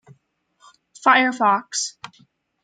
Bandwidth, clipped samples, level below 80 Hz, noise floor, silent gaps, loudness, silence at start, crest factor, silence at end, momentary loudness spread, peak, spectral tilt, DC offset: 9.6 kHz; under 0.1%; -78 dBFS; -64 dBFS; none; -19 LUFS; 1.05 s; 22 dB; 0.55 s; 22 LU; -2 dBFS; -1.5 dB/octave; under 0.1%